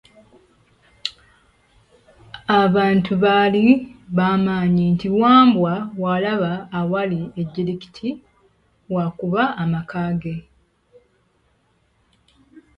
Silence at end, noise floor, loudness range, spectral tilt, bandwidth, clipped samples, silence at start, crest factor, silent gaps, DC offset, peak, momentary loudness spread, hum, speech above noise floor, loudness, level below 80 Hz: 2.4 s; -63 dBFS; 9 LU; -8 dB/octave; 7.4 kHz; under 0.1%; 1.05 s; 20 dB; none; under 0.1%; 0 dBFS; 15 LU; none; 45 dB; -19 LUFS; -54 dBFS